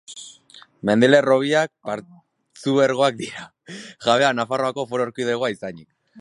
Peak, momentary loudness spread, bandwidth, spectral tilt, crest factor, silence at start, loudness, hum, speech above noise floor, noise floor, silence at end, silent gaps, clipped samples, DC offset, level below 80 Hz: -2 dBFS; 22 LU; 11.5 kHz; -5 dB/octave; 20 dB; 0.1 s; -20 LUFS; none; 29 dB; -49 dBFS; 0 s; none; under 0.1%; under 0.1%; -66 dBFS